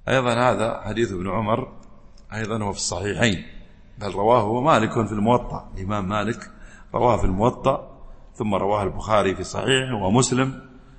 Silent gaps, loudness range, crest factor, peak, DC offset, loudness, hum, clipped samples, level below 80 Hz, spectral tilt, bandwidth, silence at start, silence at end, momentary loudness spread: none; 3 LU; 20 dB; -2 dBFS; under 0.1%; -22 LUFS; none; under 0.1%; -38 dBFS; -5 dB/octave; 8.8 kHz; 0.05 s; 0 s; 12 LU